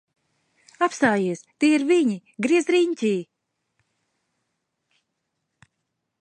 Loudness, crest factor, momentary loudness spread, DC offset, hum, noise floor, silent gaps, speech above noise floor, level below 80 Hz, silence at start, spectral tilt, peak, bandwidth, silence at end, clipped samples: -22 LUFS; 18 dB; 7 LU; under 0.1%; none; -79 dBFS; none; 58 dB; -72 dBFS; 0.8 s; -5 dB/octave; -6 dBFS; 9.8 kHz; 3 s; under 0.1%